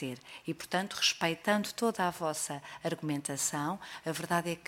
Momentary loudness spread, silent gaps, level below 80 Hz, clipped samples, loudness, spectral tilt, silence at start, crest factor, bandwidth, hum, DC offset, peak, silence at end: 10 LU; none; -72 dBFS; under 0.1%; -33 LUFS; -3 dB/octave; 0 s; 20 dB; 16.5 kHz; none; under 0.1%; -14 dBFS; 0.05 s